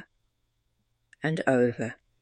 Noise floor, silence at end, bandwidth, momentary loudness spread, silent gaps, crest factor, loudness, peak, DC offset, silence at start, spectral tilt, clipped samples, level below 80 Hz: -75 dBFS; 0.25 s; 9.8 kHz; 11 LU; none; 22 dB; -28 LUFS; -8 dBFS; under 0.1%; 1.25 s; -7 dB/octave; under 0.1%; -70 dBFS